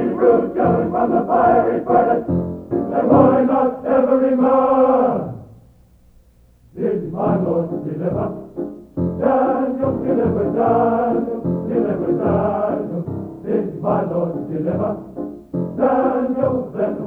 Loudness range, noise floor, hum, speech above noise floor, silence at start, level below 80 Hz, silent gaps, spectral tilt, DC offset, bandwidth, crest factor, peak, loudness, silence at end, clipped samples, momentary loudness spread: 7 LU; -51 dBFS; none; 34 dB; 0 s; -48 dBFS; none; -11 dB/octave; under 0.1%; 4.3 kHz; 18 dB; 0 dBFS; -18 LUFS; 0 s; under 0.1%; 11 LU